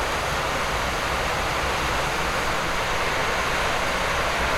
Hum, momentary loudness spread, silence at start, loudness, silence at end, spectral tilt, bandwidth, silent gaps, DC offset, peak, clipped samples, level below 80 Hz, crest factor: none; 1 LU; 0 s; -23 LUFS; 0 s; -3 dB/octave; 16.5 kHz; none; under 0.1%; -12 dBFS; under 0.1%; -36 dBFS; 12 dB